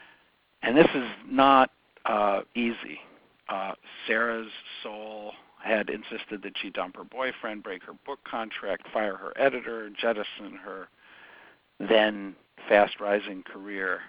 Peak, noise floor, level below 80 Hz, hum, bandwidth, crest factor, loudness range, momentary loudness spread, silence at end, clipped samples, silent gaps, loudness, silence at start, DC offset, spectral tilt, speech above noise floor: -4 dBFS; -63 dBFS; -64 dBFS; none; 5.2 kHz; 26 dB; 9 LU; 19 LU; 0 s; under 0.1%; none; -27 LUFS; 0.6 s; under 0.1%; -8.5 dB/octave; 36 dB